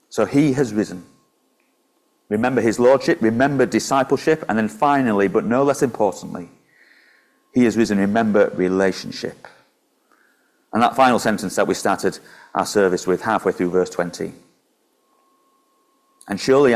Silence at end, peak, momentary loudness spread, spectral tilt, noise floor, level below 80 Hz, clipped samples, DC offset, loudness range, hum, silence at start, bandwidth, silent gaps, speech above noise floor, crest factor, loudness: 0 s; -4 dBFS; 12 LU; -5.5 dB/octave; -64 dBFS; -56 dBFS; under 0.1%; under 0.1%; 4 LU; none; 0.1 s; 15.5 kHz; none; 46 dB; 16 dB; -19 LUFS